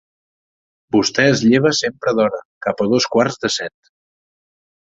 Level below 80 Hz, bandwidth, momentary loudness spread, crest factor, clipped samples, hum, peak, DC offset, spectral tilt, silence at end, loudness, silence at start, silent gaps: -56 dBFS; 8 kHz; 9 LU; 18 dB; under 0.1%; none; -2 dBFS; under 0.1%; -4.5 dB/octave; 1.15 s; -17 LUFS; 0.95 s; 2.45-2.61 s